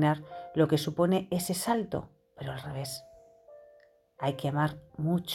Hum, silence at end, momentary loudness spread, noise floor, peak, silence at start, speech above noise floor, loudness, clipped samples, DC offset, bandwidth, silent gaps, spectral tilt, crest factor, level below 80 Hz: none; 0 s; 12 LU; -61 dBFS; -14 dBFS; 0 s; 31 dB; -31 LUFS; under 0.1%; under 0.1%; 17 kHz; none; -6 dB/octave; 18 dB; -62 dBFS